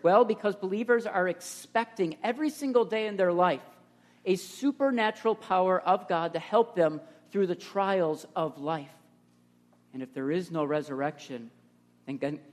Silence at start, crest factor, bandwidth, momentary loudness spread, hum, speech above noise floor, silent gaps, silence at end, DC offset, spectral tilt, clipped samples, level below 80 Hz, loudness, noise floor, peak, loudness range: 0.05 s; 20 dB; 13.5 kHz; 12 LU; 60 Hz at -60 dBFS; 35 dB; none; 0.1 s; under 0.1%; -5.5 dB/octave; under 0.1%; -80 dBFS; -29 LUFS; -63 dBFS; -10 dBFS; 7 LU